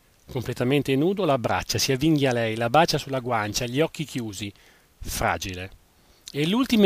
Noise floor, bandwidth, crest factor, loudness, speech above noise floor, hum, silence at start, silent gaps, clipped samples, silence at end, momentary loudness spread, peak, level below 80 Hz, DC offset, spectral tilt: -49 dBFS; 15.5 kHz; 20 dB; -24 LUFS; 26 dB; none; 0.3 s; none; under 0.1%; 0 s; 14 LU; -4 dBFS; -46 dBFS; under 0.1%; -5 dB/octave